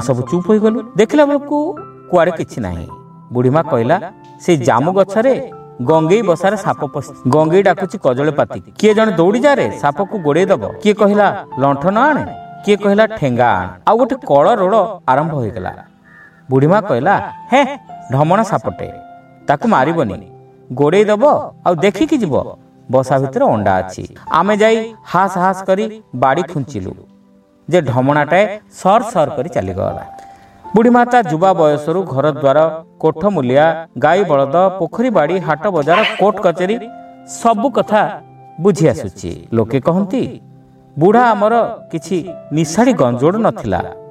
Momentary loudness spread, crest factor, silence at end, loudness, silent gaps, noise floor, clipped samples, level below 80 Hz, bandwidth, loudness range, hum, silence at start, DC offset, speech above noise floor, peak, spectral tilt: 11 LU; 14 dB; 0 s; -14 LUFS; none; -49 dBFS; under 0.1%; -50 dBFS; 13.5 kHz; 3 LU; none; 0 s; under 0.1%; 35 dB; 0 dBFS; -6.5 dB/octave